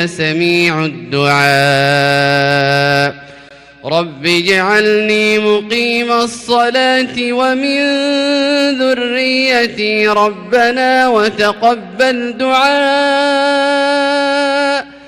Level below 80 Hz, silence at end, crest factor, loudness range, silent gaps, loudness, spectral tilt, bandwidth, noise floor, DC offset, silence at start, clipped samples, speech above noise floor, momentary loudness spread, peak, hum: -54 dBFS; 0 s; 10 dB; 1 LU; none; -12 LUFS; -4.5 dB/octave; 16 kHz; -38 dBFS; under 0.1%; 0 s; under 0.1%; 26 dB; 4 LU; -2 dBFS; none